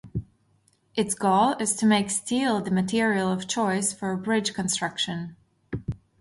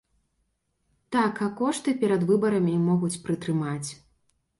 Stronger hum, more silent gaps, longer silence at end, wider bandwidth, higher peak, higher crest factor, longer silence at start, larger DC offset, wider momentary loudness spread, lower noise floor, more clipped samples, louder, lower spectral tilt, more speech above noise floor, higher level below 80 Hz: neither; neither; second, 0.25 s vs 0.65 s; about the same, 11.5 kHz vs 11.5 kHz; about the same, -8 dBFS vs -10 dBFS; about the same, 18 dB vs 16 dB; second, 0.05 s vs 1.1 s; neither; first, 14 LU vs 7 LU; second, -65 dBFS vs -74 dBFS; neither; about the same, -25 LUFS vs -26 LUFS; second, -4 dB/octave vs -6.5 dB/octave; second, 41 dB vs 50 dB; first, -54 dBFS vs -64 dBFS